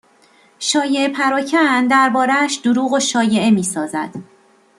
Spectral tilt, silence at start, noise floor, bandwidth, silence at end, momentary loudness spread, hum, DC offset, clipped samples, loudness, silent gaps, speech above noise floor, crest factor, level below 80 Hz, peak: -3.5 dB/octave; 0.6 s; -52 dBFS; 13 kHz; 0.55 s; 10 LU; none; under 0.1%; under 0.1%; -16 LUFS; none; 36 dB; 16 dB; -64 dBFS; -2 dBFS